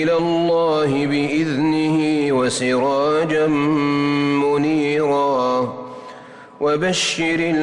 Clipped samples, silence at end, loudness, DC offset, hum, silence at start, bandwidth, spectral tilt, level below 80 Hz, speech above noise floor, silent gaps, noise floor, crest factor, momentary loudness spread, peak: under 0.1%; 0 s; -18 LUFS; under 0.1%; none; 0 s; 11 kHz; -5 dB/octave; -56 dBFS; 22 dB; none; -39 dBFS; 8 dB; 4 LU; -10 dBFS